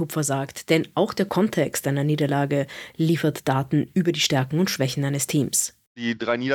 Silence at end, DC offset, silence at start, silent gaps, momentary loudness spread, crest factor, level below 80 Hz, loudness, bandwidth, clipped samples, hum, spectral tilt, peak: 0 s; under 0.1%; 0 s; 5.87-5.95 s; 5 LU; 18 dB; -62 dBFS; -23 LUFS; 18 kHz; under 0.1%; none; -4.5 dB/octave; -6 dBFS